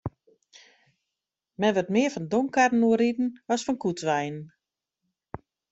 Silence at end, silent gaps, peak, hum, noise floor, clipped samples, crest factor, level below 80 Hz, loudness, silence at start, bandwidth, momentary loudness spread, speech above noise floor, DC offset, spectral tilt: 0.35 s; none; -8 dBFS; none; -86 dBFS; under 0.1%; 20 dB; -62 dBFS; -25 LUFS; 0.05 s; 8 kHz; 21 LU; 62 dB; under 0.1%; -5.5 dB/octave